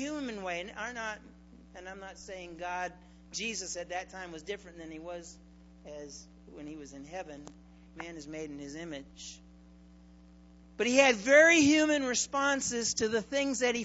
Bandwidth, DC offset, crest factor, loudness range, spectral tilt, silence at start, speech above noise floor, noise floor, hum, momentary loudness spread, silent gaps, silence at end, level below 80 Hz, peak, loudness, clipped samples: 8.2 kHz; under 0.1%; 24 dB; 20 LU; -2.5 dB/octave; 0 s; 24 dB; -56 dBFS; none; 23 LU; none; 0 s; -60 dBFS; -8 dBFS; -29 LUFS; under 0.1%